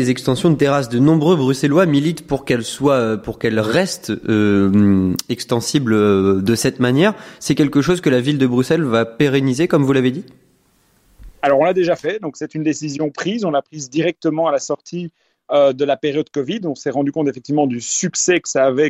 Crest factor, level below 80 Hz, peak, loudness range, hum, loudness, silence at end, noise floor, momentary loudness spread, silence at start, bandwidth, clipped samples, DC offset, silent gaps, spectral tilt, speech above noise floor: 14 dB; -50 dBFS; -2 dBFS; 4 LU; none; -17 LUFS; 0 s; -58 dBFS; 8 LU; 0 s; 16 kHz; under 0.1%; under 0.1%; none; -5.5 dB/octave; 41 dB